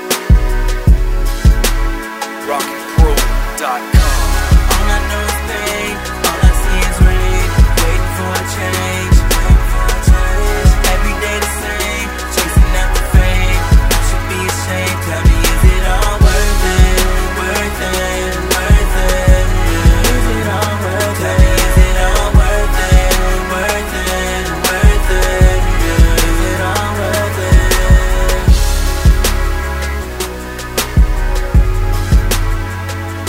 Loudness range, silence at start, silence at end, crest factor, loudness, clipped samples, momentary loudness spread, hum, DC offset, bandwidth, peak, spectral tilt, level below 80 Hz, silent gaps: 2 LU; 0 s; 0 s; 12 dB; -14 LUFS; under 0.1%; 6 LU; none; under 0.1%; 16.5 kHz; 0 dBFS; -4.5 dB/octave; -12 dBFS; none